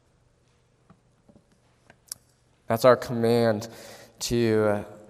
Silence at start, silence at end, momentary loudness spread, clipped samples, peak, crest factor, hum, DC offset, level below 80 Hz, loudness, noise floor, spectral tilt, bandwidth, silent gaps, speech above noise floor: 2.7 s; 0.15 s; 21 LU; under 0.1%; -4 dBFS; 22 dB; none; under 0.1%; -56 dBFS; -24 LUFS; -64 dBFS; -5.5 dB/octave; 15.5 kHz; none; 41 dB